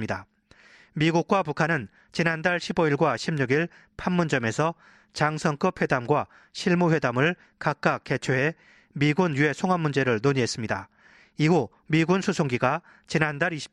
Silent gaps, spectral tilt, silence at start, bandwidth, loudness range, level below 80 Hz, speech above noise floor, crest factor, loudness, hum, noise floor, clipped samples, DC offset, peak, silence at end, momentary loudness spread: none; -6 dB/octave; 0 s; 10.5 kHz; 1 LU; -58 dBFS; 30 dB; 20 dB; -25 LUFS; none; -55 dBFS; under 0.1%; under 0.1%; -6 dBFS; 0.05 s; 9 LU